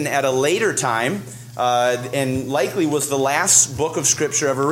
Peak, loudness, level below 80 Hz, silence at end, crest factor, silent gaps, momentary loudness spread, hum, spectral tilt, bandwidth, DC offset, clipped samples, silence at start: 0 dBFS; -18 LUFS; -56 dBFS; 0 s; 18 dB; none; 9 LU; none; -3 dB/octave; 16.5 kHz; under 0.1%; under 0.1%; 0 s